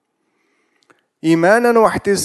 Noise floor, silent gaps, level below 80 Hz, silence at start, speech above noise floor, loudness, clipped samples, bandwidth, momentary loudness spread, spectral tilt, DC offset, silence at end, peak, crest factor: -66 dBFS; none; -50 dBFS; 1.25 s; 53 dB; -14 LUFS; under 0.1%; 12.5 kHz; 6 LU; -5 dB/octave; under 0.1%; 0 s; 0 dBFS; 16 dB